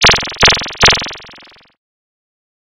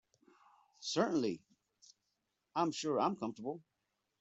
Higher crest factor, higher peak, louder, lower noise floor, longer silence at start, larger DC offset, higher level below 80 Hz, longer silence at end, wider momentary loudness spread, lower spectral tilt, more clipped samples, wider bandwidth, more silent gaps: second, 14 dB vs 22 dB; first, 0 dBFS vs -18 dBFS; first, -10 LUFS vs -37 LUFS; second, -42 dBFS vs -85 dBFS; second, 0 s vs 0.8 s; neither; first, -32 dBFS vs -82 dBFS; first, 1.45 s vs 0.6 s; about the same, 14 LU vs 12 LU; second, -1.5 dB/octave vs -4.5 dB/octave; neither; first, 18 kHz vs 8.2 kHz; neither